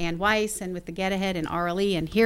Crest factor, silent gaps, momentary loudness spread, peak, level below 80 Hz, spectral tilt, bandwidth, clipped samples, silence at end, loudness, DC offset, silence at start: 18 dB; none; 7 LU; -8 dBFS; -46 dBFS; -4.5 dB/octave; 16.5 kHz; under 0.1%; 0 s; -26 LUFS; under 0.1%; 0 s